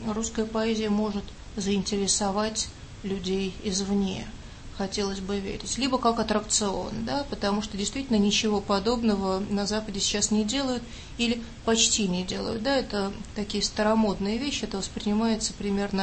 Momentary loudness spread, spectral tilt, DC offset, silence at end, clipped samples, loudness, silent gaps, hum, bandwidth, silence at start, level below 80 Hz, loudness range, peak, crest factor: 8 LU; -3.5 dB/octave; under 0.1%; 0 s; under 0.1%; -27 LUFS; none; none; 8.8 kHz; 0 s; -44 dBFS; 3 LU; -8 dBFS; 18 dB